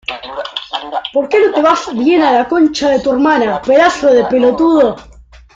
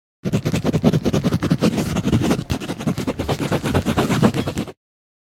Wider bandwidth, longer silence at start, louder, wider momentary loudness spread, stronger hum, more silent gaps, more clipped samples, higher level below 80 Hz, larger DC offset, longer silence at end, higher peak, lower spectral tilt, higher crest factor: second, 7.8 kHz vs 17 kHz; second, 0.1 s vs 0.25 s; first, -12 LUFS vs -20 LUFS; first, 12 LU vs 7 LU; neither; neither; neither; second, -44 dBFS vs -38 dBFS; neither; about the same, 0.55 s vs 0.55 s; about the same, 0 dBFS vs 0 dBFS; second, -4.5 dB/octave vs -6.5 dB/octave; second, 12 dB vs 20 dB